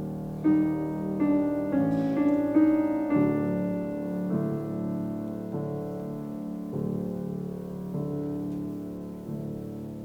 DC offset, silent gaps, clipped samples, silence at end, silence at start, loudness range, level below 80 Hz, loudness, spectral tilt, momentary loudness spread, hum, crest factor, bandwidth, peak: under 0.1%; none; under 0.1%; 0 s; 0 s; 8 LU; -58 dBFS; -29 LUFS; -9.5 dB/octave; 11 LU; none; 18 dB; 16.5 kHz; -12 dBFS